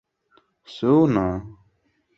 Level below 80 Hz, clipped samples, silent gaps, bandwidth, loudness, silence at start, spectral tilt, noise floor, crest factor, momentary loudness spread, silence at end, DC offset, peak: -48 dBFS; under 0.1%; none; 7 kHz; -21 LUFS; 0.7 s; -9 dB/octave; -67 dBFS; 18 dB; 16 LU; 0.7 s; under 0.1%; -6 dBFS